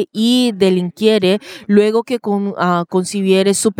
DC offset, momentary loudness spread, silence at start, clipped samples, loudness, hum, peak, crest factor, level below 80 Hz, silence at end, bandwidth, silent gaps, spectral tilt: under 0.1%; 6 LU; 0 s; under 0.1%; -15 LUFS; none; 0 dBFS; 14 dB; -62 dBFS; 0.05 s; 16.5 kHz; none; -5 dB/octave